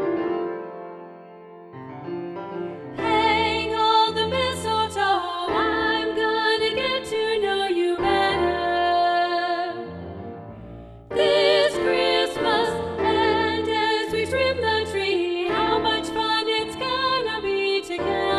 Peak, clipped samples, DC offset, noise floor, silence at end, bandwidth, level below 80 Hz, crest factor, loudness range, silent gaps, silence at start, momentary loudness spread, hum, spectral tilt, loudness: -6 dBFS; under 0.1%; under 0.1%; -43 dBFS; 0 s; 13 kHz; -50 dBFS; 16 dB; 3 LU; none; 0 s; 16 LU; none; -4.5 dB/octave; -22 LUFS